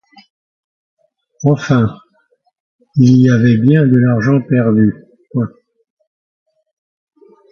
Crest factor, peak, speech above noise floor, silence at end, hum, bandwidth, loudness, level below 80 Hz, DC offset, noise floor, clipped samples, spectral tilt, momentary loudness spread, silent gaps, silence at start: 14 dB; 0 dBFS; 48 dB; 2.05 s; none; 6.8 kHz; -13 LUFS; -50 dBFS; under 0.1%; -58 dBFS; under 0.1%; -8.5 dB/octave; 12 LU; 2.60-2.79 s; 1.4 s